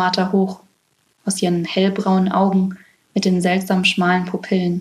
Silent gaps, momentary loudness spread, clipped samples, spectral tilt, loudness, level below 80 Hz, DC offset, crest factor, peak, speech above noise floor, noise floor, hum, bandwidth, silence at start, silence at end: none; 9 LU; under 0.1%; -5.5 dB/octave; -18 LUFS; -60 dBFS; under 0.1%; 16 dB; -2 dBFS; 46 dB; -63 dBFS; none; 13 kHz; 0 s; 0 s